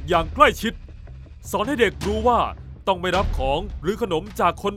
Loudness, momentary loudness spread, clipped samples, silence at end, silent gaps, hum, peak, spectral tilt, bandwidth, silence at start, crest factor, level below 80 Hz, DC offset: -22 LUFS; 19 LU; under 0.1%; 0 s; none; none; 0 dBFS; -5 dB/octave; 16 kHz; 0 s; 22 dB; -34 dBFS; under 0.1%